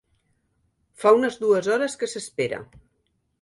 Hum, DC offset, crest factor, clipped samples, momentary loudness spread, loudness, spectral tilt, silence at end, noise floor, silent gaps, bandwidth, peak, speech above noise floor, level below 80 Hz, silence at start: none; under 0.1%; 20 dB; under 0.1%; 11 LU; -22 LUFS; -4 dB/octave; 0.8 s; -72 dBFS; none; 11.5 kHz; -4 dBFS; 49 dB; -64 dBFS; 1 s